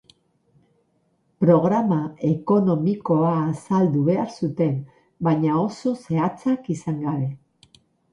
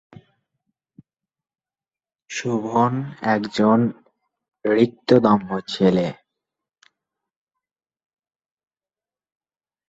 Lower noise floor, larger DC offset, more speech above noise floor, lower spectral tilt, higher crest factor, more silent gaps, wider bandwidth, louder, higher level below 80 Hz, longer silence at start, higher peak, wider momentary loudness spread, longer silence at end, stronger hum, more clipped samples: second, -67 dBFS vs under -90 dBFS; neither; second, 46 dB vs over 71 dB; first, -9 dB/octave vs -6.5 dB/octave; about the same, 18 dB vs 22 dB; neither; first, 11 kHz vs 8 kHz; about the same, -22 LUFS vs -20 LUFS; about the same, -62 dBFS vs -62 dBFS; second, 1.4 s vs 2.3 s; about the same, -4 dBFS vs -2 dBFS; second, 8 LU vs 11 LU; second, 0.75 s vs 3.75 s; neither; neither